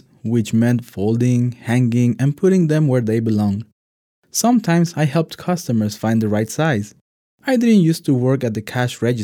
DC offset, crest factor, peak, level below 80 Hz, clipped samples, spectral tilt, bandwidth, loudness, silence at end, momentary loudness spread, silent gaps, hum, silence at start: under 0.1%; 14 dB; -4 dBFS; -64 dBFS; under 0.1%; -6.5 dB/octave; 19 kHz; -18 LUFS; 0 s; 7 LU; 3.72-4.23 s, 7.01-7.38 s; none; 0.25 s